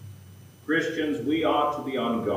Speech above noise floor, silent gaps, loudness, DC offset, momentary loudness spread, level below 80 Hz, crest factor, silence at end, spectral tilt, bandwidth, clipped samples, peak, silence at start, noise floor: 23 dB; none; -26 LUFS; under 0.1%; 9 LU; -68 dBFS; 16 dB; 0 s; -5.5 dB/octave; 15.5 kHz; under 0.1%; -12 dBFS; 0 s; -48 dBFS